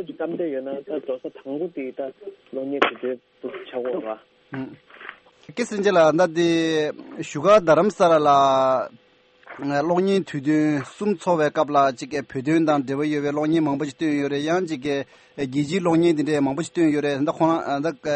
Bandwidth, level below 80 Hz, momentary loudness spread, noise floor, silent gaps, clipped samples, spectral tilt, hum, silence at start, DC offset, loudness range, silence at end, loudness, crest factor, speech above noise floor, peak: 8.8 kHz; -64 dBFS; 17 LU; -47 dBFS; none; under 0.1%; -6 dB/octave; none; 0 s; under 0.1%; 9 LU; 0 s; -22 LUFS; 22 dB; 25 dB; 0 dBFS